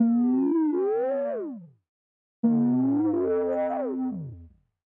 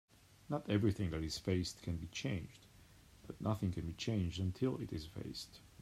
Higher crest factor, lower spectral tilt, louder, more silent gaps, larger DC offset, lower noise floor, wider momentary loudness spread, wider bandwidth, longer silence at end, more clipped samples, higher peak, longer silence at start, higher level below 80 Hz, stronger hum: second, 12 dB vs 18 dB; first, -12.5 dB/octave vs -6 dB/octave; first, -25 LUFS vs -40 LUFS; first, 1.89-2.43 s vs none; neither; second, -50 dBFS vs -62 dBFS; about the same, 12 LU vs 11 LU; second, 2.9 kHz vs 15 kHz; first, 0.4 s vs 0 s; neither; first, -14 dBFS vs -22 dBFS; second, 0 s vs 0.5 s; second, -70 dBFS vs -60 dBFS; neither